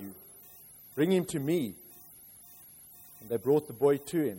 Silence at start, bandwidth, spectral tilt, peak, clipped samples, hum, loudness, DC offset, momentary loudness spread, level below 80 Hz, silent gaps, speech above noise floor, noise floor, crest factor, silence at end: 0 s; 16.5 kHz; -6 dB/octave; -14 dBFS; under 0.1%; none; -30 LUFS; under 0.1%; 22 LU; -70 dBFS; none; 25 dB; -53 dBFS; 18 dB; 0 s